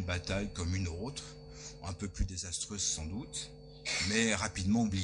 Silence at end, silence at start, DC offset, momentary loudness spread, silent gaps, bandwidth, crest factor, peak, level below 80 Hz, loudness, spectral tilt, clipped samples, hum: 0 s; 0 s; under 0.1%; 15 LU; none; 10.5 kHz; 20 dB; -16 dBFS; -48 dBFS; -35 LUFS; -3.5 dB/octave; under 0.1%; none